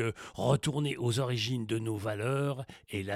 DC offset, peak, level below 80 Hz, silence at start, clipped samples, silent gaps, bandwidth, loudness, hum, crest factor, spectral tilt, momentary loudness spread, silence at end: under 0.1%; -14 dBFS; -64 dBFS; 0 s; under 0.1%; none; 14.5 kHz; -32 LUFS; none; 18 dB; -5.5 dB/octave; 7 LU; 0 s